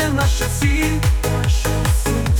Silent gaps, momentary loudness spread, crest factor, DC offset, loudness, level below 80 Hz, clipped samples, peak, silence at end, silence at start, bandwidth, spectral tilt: none; 1 LU; 12 dB; under 0.1%; -18 LUFS; -20 dBFS; under 0.1%; -6 dBFS; 0 s; 0 s; 19.5 kHz; -5 dB/octave